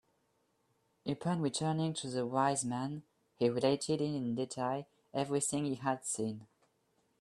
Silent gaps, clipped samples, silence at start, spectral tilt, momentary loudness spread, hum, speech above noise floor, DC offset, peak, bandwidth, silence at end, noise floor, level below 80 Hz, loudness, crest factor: none; under 0.1%; 1.05 s; -5 dB/octave; 10 LU; none; 42 dB; under 0.1%; -16 dBFS; 13 kHz; 0.75 s; -77 dBFS; -74 dBFS; -35 LUFS; 20 dB